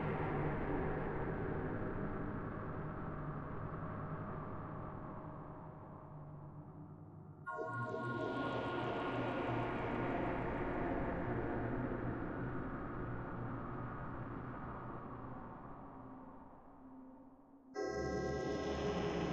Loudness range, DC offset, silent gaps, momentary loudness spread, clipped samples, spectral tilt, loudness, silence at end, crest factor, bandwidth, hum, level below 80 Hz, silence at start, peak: 10 LU; under 0.1%; none; 14 LU; under 0.1%; -7.5 dB/octave; -42 LUFS; 0 s; 16 dB; 8.4 kHz; none; -54 dBFS; 0 s; -26 dBFS